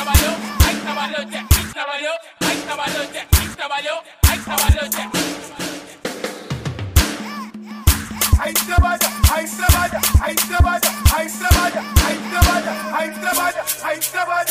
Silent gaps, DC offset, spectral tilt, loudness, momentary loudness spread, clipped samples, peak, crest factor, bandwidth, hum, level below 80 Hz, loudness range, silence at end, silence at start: none; under 0.1%; -3.5 dB/octave; -18 LUFS; 11 LU; under 0.1%; 0 dBFS; 18 dB; 16 kHz; none; -22 dBFS; 5 LU; 0 s; 0 s